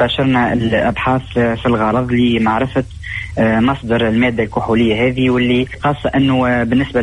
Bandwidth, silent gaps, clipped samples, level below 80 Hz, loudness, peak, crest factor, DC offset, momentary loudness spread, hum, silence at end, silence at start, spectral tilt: 10.5 kHz; none; under 0.1%; -36 dBFS; -15 LUFS; -4 dBFS; 10 dB; under 0.1%; 5 LU; none; 0 s; 0 s; -7.5 dB/octave